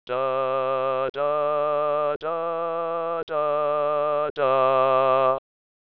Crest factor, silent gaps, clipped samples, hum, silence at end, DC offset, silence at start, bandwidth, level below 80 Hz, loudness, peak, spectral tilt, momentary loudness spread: 14 dB; 1.10-1.14 s, 2.16-2.20 s, 3.23-3.27 s, 4.30-4.36 s; under 0.1%; none; 0.5 s; 0.3%; 0.1 s; 5.4 kHz; -72 dBFS; -23 LUFS; -8 dBFS; -8 dB/octave; 7 LU